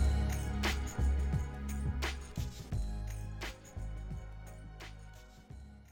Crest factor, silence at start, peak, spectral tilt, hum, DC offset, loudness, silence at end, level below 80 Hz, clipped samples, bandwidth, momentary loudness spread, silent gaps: 14 dB; 0 s; -22 dBFS; -5.5 dB/octave; none; under 0.1%; -38 LUFS; 0 s; -38 dBFS; under 0.1%; 17 kHz; 18 LU; none